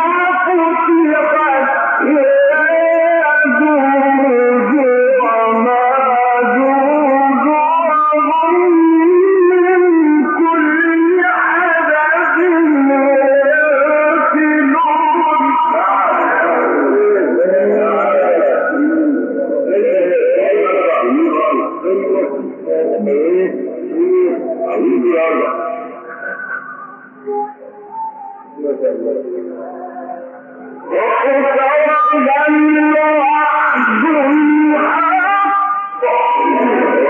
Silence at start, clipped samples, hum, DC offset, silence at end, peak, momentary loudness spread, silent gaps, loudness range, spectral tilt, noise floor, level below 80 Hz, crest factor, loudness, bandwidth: 0 s; under 0.1%; none; under 0.1%; 0 s; -4 dBFS; 12 LU; none; 8 LU; -8 dB/octave; -33 dBFS; -82 dBFS; 8 dB; -12 LUFS; 3.6 kHz